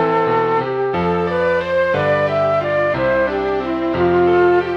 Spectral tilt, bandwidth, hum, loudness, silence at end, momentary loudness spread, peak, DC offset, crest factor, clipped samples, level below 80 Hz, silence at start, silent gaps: -8 dB/octave; 6.6 kHz; none; -17 LUFS; 0 s; 5 LU; -4 dBFS; under 0.1%; 12 dB; under 0.1%; -44 dBFS; 0 s; none